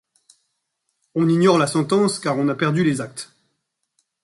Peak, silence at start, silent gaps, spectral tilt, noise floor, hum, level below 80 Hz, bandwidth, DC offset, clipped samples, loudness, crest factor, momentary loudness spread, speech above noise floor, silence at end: -2 dBFS; 1.15 s; none; -6 dB/octave; -75 dBFS; none; -64 dBFS; 11.5 kHz; under 0.1%; under 0.1%; -19 LUFS; 18 dB; 15 LU; 56 dB; 1 s